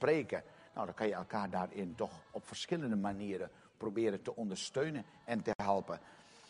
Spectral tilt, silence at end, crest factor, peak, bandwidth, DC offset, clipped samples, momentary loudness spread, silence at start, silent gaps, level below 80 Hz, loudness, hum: -5.5 dB/octave; 0.05 s; 22 dB; -18 dBFS; 10.5 kHz; under 0.1%; under 0.1%; 11 LU; 0 s; 5.55-5.59 s; -72 dBFS; -39 LUFS; none